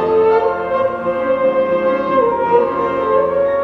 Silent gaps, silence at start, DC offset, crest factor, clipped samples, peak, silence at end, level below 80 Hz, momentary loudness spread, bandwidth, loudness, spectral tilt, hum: none; 0 s; under 0.1%; 14 dB; under 0.1%; -2 dBFS; 0 s; -50 dBFS; 4 LU; 5.6 kHz; -15 LUFS; -7.5 dB/octave; none